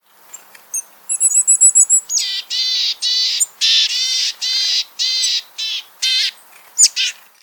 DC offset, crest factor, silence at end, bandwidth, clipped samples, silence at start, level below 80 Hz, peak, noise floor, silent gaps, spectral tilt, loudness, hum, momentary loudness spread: under 0.1%; 18 dB; 0.3 s; 19 kHz; under 0.1%; 0.35 s; -86 dBFS; 0 dBFS; -41 dBFS; none; 7 dB/octave; -13 LUFS; none; 13 LU